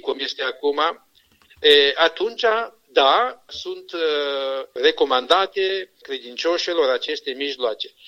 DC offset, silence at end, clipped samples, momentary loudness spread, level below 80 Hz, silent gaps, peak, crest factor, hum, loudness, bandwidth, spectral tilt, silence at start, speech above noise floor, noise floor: under 0.1%; 0.2 s; under 0.1%; 14 LU; -66 dBFS; none; -2 dBFS; 20 dB; none; -20 LUFS; 14 kHz; -1.5 dB/octave; 0.05 s; 35 dB; -56 dBFS